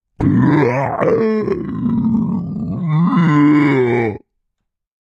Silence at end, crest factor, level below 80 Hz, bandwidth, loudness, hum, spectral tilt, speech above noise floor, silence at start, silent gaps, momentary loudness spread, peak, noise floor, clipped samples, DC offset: 0.85 s; 14 dB; -44 dBFS; 7.2 kHz; -15 LUFS; none; -9.5 dB/octave; 59 dB; 0.2 s; none; 10 LU; 0 dBFS; -74 dBFS; under 0.1%; under 0.1%